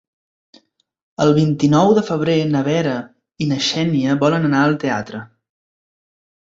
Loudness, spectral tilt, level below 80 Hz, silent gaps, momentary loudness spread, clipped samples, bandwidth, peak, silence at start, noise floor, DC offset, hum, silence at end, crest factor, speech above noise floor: -17 LUFS; -6 dB/octave; -56 dBFS; none; 11 LU; under 0.1%; 7.8 kHz; -2 dBFS; 1.2 s; -56 dBFS; under 0.1%; none; 1.35 s; 16 dB; 40 dB